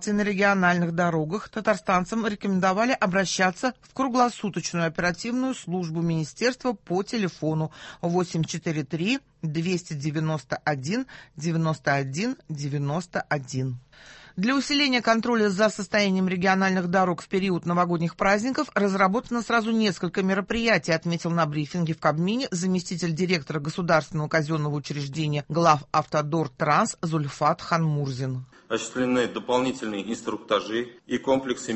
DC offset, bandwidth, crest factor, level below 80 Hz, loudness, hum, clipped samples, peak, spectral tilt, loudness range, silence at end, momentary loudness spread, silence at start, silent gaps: under 0.1%; 8.6 kHz; 20 dB; -58 dBFS; -25 LUFS; none; under 0.1%; -4 dBFS; -5.5 dB/octave; 5 LU; 0 s; 8 LU; 0 s; none